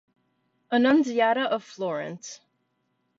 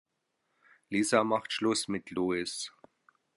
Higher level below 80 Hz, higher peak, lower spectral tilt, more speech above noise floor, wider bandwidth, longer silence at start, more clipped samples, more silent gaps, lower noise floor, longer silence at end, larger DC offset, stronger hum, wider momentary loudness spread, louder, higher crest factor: second, -76 dBFS vs -70 dBFS; about the same, -10 dBFS vs -10 dBFS; about the same, -4.5 dB/octave vs -3.5 dB/octave; about the same, 50 dB vs 50 dB; second, 7.8 kHz vs 11.5 kHz; second, 0.7 s vs 0.9 s; neither; neither; second, -74 dBFS vs -80 dBFS; first, 0.85 s vs 0.65 s; neither; neither; first, 16 LU vs 10 LU; first, -24 LUFS vs -31 LUFS; about the same, 18 dB vs 22 dB